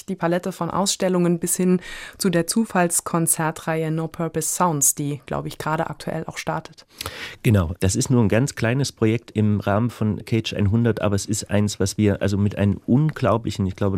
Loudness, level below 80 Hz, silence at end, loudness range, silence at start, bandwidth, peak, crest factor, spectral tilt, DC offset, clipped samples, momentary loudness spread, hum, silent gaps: -22 LUFS; -48 dBFS; 0 s; 3 LU; 0.1 s; 16 kHz; -4 dBFS; 16 dB; -5 dB/octave; under 0.1%; under 0.1%; 8 LU; none; none